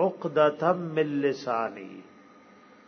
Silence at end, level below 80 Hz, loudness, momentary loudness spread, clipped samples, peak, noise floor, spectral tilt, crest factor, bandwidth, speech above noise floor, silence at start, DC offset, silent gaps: 0.85 s; -78 dBFS; -27 LUFS; 20 LU; under 0.1%; -10 dBFS; -54 dBFS; -7 dB/octave; 20 dB; 6.6 kHz; 28 dB; 0 s; under 0.1%; none